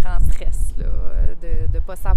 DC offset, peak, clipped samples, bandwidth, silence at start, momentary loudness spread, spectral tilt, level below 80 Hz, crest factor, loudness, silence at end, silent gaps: under 0.1%; -2 dBFS; under 0.1%; 11 kHz; 0 s; 4 LU; -6.5 dB/octave; -18 dBFS; 10 dB; -26 LUFS; 0 s; none